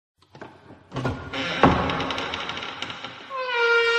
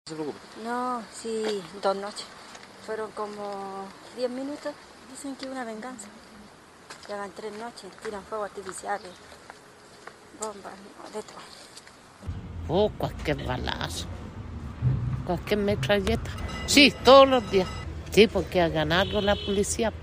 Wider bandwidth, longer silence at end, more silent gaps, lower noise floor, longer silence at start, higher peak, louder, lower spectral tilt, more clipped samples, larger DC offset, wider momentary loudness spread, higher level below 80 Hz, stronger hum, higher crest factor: second, 9.8 kHz vs 15.5 kHz; about the same, 0 s vs 0 s; neither; about the same, -47 dBFS vs -50 dBFS; first, 0.35 s vs 0.05 s; about the same, -2 dBFS vs -4 dBFS; about the same, -25 LUFS vs -26 LUFS; about the same, -5 dB/octave vs -4.5 dB/octave; neither; neither; about the same, 22 LU vs 23 LU; about the same, -46 dBFS vs -44 dBFS; neither; about the same, 24 dB vs 24 dB